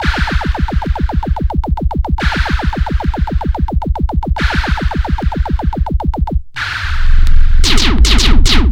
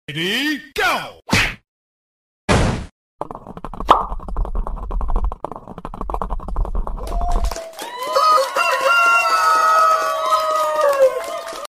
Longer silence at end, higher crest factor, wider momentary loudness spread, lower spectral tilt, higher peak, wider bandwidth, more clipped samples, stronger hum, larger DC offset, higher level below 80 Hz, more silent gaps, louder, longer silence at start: about the same, 0 s vs 0 s; second, 10 dB vs 18 dB; second, 7 LU vs 18 LU; about the same, -4.5 dB/octave vs -4 dB/octave; about the same, 0 dBFS vs 0 dBFS; second, 10.5 kHz vs 16 kHz; first, 0.5% vs under 0.1%; neither; neither; first, -12 dBFS vs -28 dBFS; second, none vs 1.68-2.48 s, 2.92-3.19 s; first, -15 LUFS vs -18 LUFS; about the same, 0 s vs 0.1 s